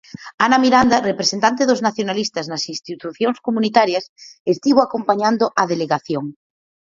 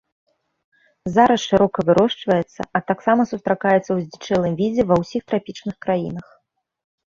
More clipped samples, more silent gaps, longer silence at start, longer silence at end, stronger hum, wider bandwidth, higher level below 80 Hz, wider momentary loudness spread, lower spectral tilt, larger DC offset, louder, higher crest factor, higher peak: neither; first, 0.34-0.38 s, 4.09-4.16 s, 4.40-4.45 s vs none; second, 0.2 s vs 1.05 s; second, 0.55 s vs 0.9 s; neither; about the same, 7.6 kHz vs 7.6 kHz; about the same, -54 dBFS vs -52 dBFS; first, 12 LU vs 9 LU; second, -4 dB/octave vs -6.5 dB/octave; neither; about the same, -18 LUFS vs -19 LUFS; about the same, 18 dB vs 18 dB; about the same, 0 dBFS vs -2 dBFS